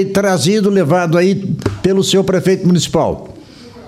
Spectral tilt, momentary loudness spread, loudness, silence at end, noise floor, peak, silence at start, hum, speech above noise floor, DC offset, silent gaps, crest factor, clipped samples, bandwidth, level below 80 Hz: -5.5 dB/octave; 5 LU; -13 LUFS; 0 s; -36 dBFS; 0 dBFS; 0 s; none; 23 dB; under 0.1%; none; 14 dB; under 0.1%; 15 kHz; -42 dBFS